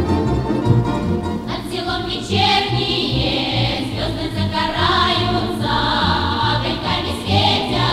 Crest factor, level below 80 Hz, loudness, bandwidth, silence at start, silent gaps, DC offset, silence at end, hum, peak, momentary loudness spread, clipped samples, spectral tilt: 16 dB; -34 dBFS; -18 LUFS; 14 kHz; 0 s; none; under 0.1%; 0 s; none; -2 dBFS; 7 LU; under 0.1%; -5.5 dB/octave